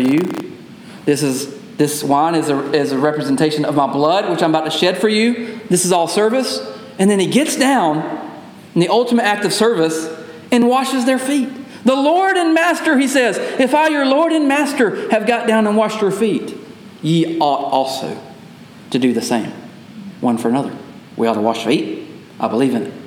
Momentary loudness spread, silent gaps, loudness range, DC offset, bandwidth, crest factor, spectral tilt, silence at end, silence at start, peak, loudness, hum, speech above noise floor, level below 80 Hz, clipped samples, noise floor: 14 LU; none; 5 LU; under 0.1%; 17 kHz; 16 dB; -4.5 dB/octave; 0 s; 0 s; 0 dBFS; -16 LUFS; none; 23 dB; -68 dBFS; under 0.1%; -38 dBFS